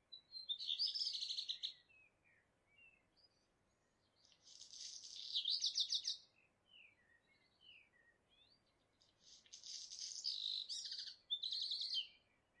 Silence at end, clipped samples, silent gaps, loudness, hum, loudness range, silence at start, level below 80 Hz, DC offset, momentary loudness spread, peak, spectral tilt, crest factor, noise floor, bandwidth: 0.45 s; under 0.1%; none; -42 LUFS; none; 15 LU; 0.1 s; under -90 dBFS; under 0.1%; 16 LU; -28 dBFS; 3 dB/octave; 22 dB; -81 dBFS; 11 kHz